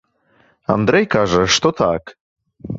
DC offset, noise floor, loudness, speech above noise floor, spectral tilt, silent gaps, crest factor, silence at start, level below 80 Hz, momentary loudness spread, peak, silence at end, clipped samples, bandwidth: under 0.1%; -57 dBFS; -16 LUFS; 41 dB; -4 dB/octave; 2.20-2.36 s; 18 dB; 0.7 s; -44 dBFS; 9 LU; 0 dBFS; 0 s; under 0.1%; 7.8 kHz